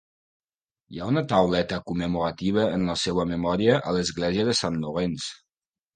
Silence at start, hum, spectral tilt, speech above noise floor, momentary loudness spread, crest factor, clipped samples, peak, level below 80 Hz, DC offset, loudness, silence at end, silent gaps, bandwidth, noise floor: 0.9 s; none; -5.5 dB/octave; over 66 dB; 7 LU; 20 dB; under 0.1%; -6 dBFS; -50 dBFS; under 0.1%; -25 LUFS; 0.6 s; none; 9.8 kHz; under -90 dBFS